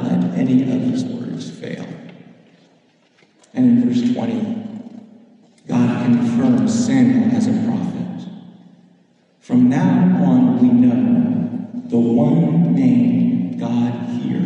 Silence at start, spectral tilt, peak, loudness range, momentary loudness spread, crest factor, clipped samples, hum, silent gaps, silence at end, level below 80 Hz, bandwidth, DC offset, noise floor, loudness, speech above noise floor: 0 s; -8 dB/octave; -4 dBFS; 7 LU; 15 LU; 14 dB; under 0.1%; none; none; 0 s; -62 dBFS; 8.6 kHz; under 0.1%; -56 dBFS; -17 LUFS; 41 dB